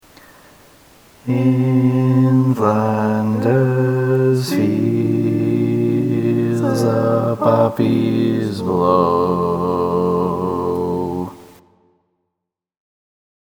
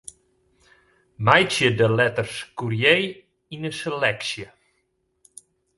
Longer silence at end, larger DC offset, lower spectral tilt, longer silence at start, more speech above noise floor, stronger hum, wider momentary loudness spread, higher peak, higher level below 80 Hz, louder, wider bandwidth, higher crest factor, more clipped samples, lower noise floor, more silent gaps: first, 1.95 s vs 1.3 s; neither; first, -8.5 dB/octave vs -4.5 dB/octave; about the same, 1.25 s vs 1.2 s; first, 65 dB vs 50 dB; neither; second, 6 LU vs 16 LU; about the same, 0 dBFS vs 0 dBFS; first, -54 dBFS vs -60 dBFS; first, -17 LUFS vs -21 LUFS; first, 19 kHz vs 11.5 kHz; second, 16 dB vs 24 dB; neither; first, -80 dBFS vs -71 dBFS; neither